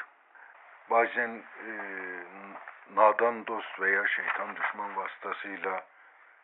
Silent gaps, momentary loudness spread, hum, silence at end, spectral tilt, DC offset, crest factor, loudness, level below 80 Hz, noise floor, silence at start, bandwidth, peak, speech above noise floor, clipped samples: none; 18 LU; none; 0.6 s; -0.5 dB/octave; under 0.1%; 24 dB; -30 LUFS; under -90 dBFS; -57 dBFS; 0 s; 4 kHz; -8 dBFS; 27 dB; under 0.1%